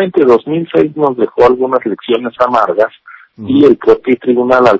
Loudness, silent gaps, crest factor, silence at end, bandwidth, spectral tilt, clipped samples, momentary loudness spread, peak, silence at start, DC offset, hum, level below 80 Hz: -11 LUFS; none; 10 dB; 0 s; 8 kHz; -7.5 dB/octave; 2%; 7 LU; 0 dBFS; 0 s; under 0.1%; none; -48 dBFS